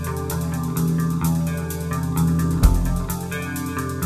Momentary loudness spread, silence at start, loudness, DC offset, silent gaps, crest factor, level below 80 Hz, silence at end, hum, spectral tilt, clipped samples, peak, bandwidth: 7 LU; 0 s; -23 LUFS; under 0.1%; none; 20 dB; -26 dBFS; 0 s; none; -6.5 dB/octave; under 0.1%; 0 dBFS; 14.5 kHz